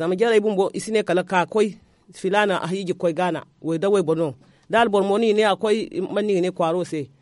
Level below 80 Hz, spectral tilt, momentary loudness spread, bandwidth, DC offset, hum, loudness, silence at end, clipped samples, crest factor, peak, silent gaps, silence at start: -64 dBFS; -5.5 dB/octave; 7 LU; 11.5 kHz; under 0.1%; none; -21 LUFS; 0.15 s; under 0.1%; 16 dB; -4 dBFS; none; 0 s